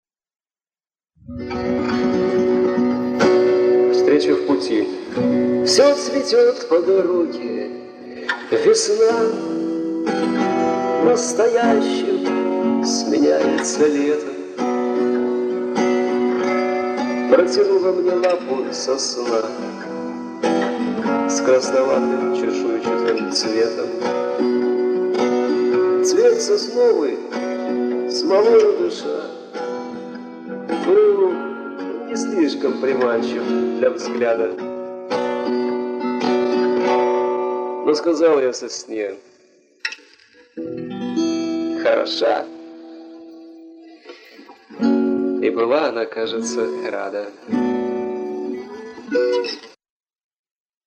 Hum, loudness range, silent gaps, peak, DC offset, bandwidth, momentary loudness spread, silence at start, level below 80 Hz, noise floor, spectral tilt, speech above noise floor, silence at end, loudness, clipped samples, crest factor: none; 6 LU; none; -2 dBFS; under 0.1%; 10.5 kHz; 13 LU; 1.3 s; -60 dBFS; under -90 dBFS; -4 dB/octave; over 72 dB; 1.2 s; -19 LUFS; under 0.1%; 18 dB